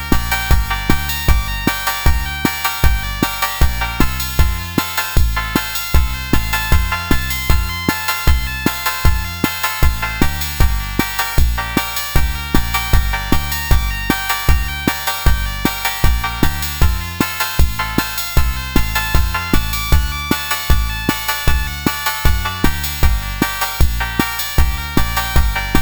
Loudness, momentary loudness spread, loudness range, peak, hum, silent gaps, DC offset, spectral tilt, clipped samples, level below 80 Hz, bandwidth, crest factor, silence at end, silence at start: -17 LUFS; 2 LU; 1 LU; 0 dBFS; none; none; under 0.1%; -4 dB/octave; under 0.1%; -18 dBFS; over 20 kHz; 16 dB; 0 s; 0 s